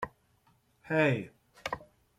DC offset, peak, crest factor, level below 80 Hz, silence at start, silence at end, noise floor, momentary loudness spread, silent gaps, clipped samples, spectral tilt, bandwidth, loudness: under 0.1%; -14 dBFS; 20 dB; -66 dBFS; 0 s; 0.35 s; -69 dBFS; 15 LU; none; under 0.1%; -6.5 dB/octave; 15 kHz; -32 LUFS